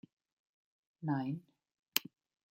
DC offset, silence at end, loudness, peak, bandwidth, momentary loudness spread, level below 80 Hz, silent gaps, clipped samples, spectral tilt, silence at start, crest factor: under 0.1%; 0.5 s; -38 LUFS; -8 dBFS; 16.5 kHz; 10 LU; -86 dBFS; 1.79-1.83 s; under 0.1%; -4 dB/octave; 1 s; 36 dB